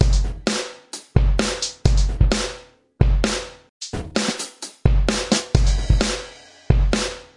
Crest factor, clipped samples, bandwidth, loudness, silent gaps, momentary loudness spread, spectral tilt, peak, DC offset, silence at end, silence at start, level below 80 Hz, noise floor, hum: 18 dB; under 0.1%; 11.5 kHz; -22 LUFS; 3.69-3.80 s; 12 LU; -4.5 dB/octave; -2 dBFS; under 0.1%; 0.15 s; 0 s; -22 dBFS; -42 dBFS; none